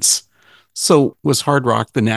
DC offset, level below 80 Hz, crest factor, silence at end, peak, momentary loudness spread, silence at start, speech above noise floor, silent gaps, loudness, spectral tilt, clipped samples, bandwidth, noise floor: under 0.1%; -54 dBFS; 16 dB; 0 s; 0 dBFS; 6 LU; 0 s; 37 dB; none; -16 LUFS; -4 dB/octave; under 0.1%; 13 kHz; -52 dBFS